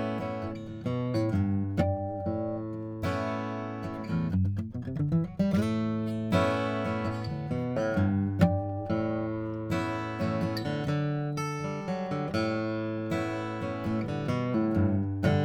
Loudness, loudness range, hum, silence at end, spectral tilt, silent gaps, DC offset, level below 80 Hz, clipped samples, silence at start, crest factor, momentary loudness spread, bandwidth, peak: -30 LUFS; 3 LU; none; 0 s; -8 dB/octave; none; under 0.1%; -56 dBFS; under 0.1%; 0 s; 20 dB; 7 LU; 13 kHz; -10 dBFS